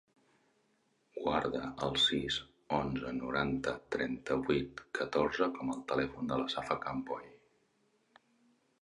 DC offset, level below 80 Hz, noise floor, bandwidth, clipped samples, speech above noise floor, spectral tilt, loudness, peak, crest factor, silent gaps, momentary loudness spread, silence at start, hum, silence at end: under 0.1%; -60 dBFS; -75 dBFS; 11 kHz; under 0.1%; 40 dB; -5 dB/octave; -35 LUFS; -14 dBFS; 22 dB; none; 9 LU; 1.15 s; none; 1.45 s